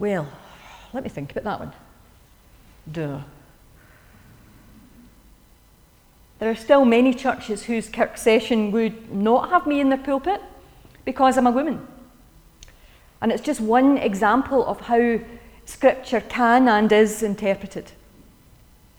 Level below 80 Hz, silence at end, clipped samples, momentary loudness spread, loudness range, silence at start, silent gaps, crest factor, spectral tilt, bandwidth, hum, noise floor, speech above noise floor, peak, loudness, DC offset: -52 dBFS; 1.15 s; under 0.1%; 16 LU; 17 LU; 0 s; none; 20 dB; -5.5 dB/octave; over 20 kHz; none; -54 dBFS; 34 dB; -4 dBFS; -21 LUFS; under 0.1%